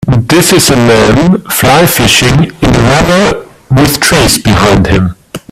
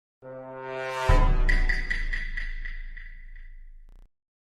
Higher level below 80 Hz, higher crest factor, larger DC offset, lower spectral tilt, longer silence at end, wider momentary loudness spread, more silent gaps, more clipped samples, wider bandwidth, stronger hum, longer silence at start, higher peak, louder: about the same, -24 dBFS vs -28 dBFS; second, 6 dB vs 20 dB; neither; about the same, -4.5 dB/octave vs -5.5 dB/octave; second, 0.15 s vs 0.55 s; second, 6 LU vs 22 LU; neither; first, 0.4% vs under 0.1%; first, 18 kHz vs 9.6 kHz; neither; second, 0 s vs 0.25 s; first, 0 dBFS vs -8 dBFS; first, -6 LUFS vs -29 LUFS